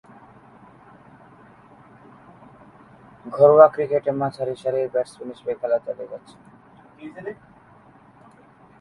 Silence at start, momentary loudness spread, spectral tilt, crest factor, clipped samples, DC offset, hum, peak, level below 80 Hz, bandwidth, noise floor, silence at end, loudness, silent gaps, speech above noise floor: 3.25 s; 26 LU; -7.5 dB/octave; 24 dB; under 0.1%; under 0.1%; none; 0 dBFS; -66 dBFS; 10.5 kHz; -51 dBFS; 1.45 s; -20 LUFS; none; 31 dB